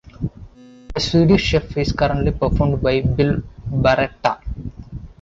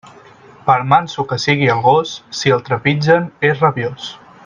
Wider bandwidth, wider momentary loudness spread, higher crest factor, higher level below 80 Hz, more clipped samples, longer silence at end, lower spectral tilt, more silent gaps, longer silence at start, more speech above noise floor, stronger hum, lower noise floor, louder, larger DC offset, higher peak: second, 7.8 kHz vs 9.4 kHz; first, 16 LU vs 10 LU; about the same, 16 dB vs 16 dB; first, -30 dBFS vs -54 dBFS; neither; second, 0.15 s vs 0.3 s; about the same, -6.5 dB/octave vs -5.5 dB/octave; neither; about the same, 0.05 s vs 0.05 s; about the same, 24 dB vs 27 dB; neither; about the same, -41 dBFS vs -42 dBFS; second, -19 LUFS vs -15 LUFS; neither; second, -4 dBFS vs 0 dBFS